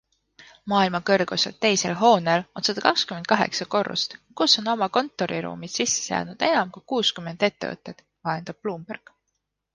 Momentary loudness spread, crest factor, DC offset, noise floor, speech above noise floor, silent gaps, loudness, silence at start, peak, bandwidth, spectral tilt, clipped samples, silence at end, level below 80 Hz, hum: 13 LU; 22 dB; under 0.1%; -78 dBFS; 55 dB; none; -23 LUFS; 0.4 s; -2 dBFS; 10.5 kHz; -3 dB/octave; under 0.1%; 0.75 s; -66 dBFS; none